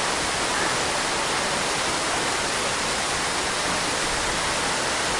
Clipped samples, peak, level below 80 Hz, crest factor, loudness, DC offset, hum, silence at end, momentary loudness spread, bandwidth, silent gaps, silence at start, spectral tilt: under 0.1%; -10 dBFS; -46 dBFS; 14 dB; -23 LUFS; under 0.1%; none; 0 s; 1 LU; 11.5 kHz; none; 0 s; -1.5 dB/octave